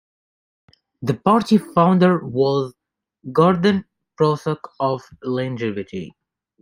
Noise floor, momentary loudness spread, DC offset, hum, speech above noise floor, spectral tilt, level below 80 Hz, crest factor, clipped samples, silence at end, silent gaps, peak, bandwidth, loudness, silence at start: -55 dBFS; 14 LU; under 0.1%; none; 37 dB; -7.5 dB/octave; -58 dBFS; 18 dB; under 0.1%; 0.55 s; none; -2 dBFS; 15 kHz; -19 LUFS; 1 s